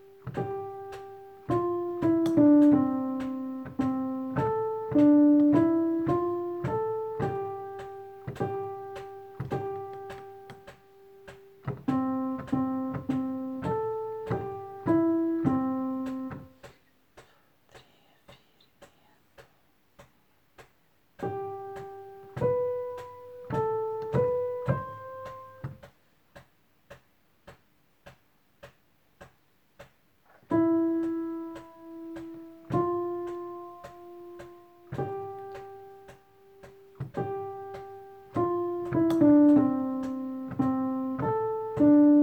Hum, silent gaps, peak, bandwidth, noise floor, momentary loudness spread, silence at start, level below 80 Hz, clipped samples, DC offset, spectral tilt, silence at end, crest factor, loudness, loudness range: none; none; -10 dBFS; 8.2 kHz; -68 dBFS; 23 LU; 0.25 s; -60 dBFS; under 0.1%; under 0.1%; -9.5 dB/octave; 0 s; 18 dB; -28 LUFS; 15 LU